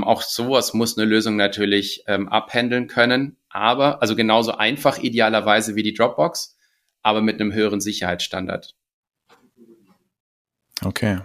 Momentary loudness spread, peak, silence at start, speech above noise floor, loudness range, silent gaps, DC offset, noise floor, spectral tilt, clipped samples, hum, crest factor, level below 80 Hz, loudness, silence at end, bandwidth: 8 LU; 0 dBFS; 0 s; 35 dB; 8 LU; 8.94-9.03 s, 10.20-10.45 s; under 0.1%; -55 dBFS; -4 dB/octave; under 0.1%; none; 20 dB; -58 dBFS; -20 LUFS; 0 s; 15.5 kHz